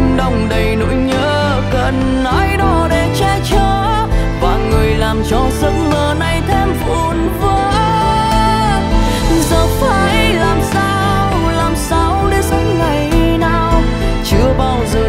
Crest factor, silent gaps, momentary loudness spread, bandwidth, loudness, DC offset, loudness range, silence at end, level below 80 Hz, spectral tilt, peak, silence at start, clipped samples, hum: 12 dB; none; 3 LU; 16 kHz; -13 LUFS; under 0.1%; 1 LU; 0 s; -18 dBFS; -5.5 dB/octave; 0 dBFS; 0 s; under 0.1%; none